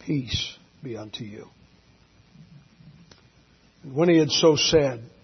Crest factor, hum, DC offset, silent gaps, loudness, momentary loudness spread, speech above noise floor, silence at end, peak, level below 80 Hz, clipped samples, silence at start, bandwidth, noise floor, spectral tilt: 20 dB; none; under 0.1%; none; -22 LUFS; 21 LU; 35 dB; 0.15 s; -6 dBFS; -52 dBFS; under 0.1%; 0.05 s; 6.4 kHz; -58 dBFS; -4.5 dB/octave